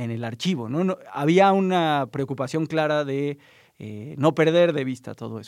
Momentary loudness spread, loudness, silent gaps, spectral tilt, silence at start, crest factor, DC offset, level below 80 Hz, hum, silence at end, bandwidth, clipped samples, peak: 17 LU; -22 LUFS; none; -6.5 dB/octave; 0 s; 18 dB; under 0.1%; -72 dBFS; none; 0 s; 13 kHz; under 0.1%; -4 dBFS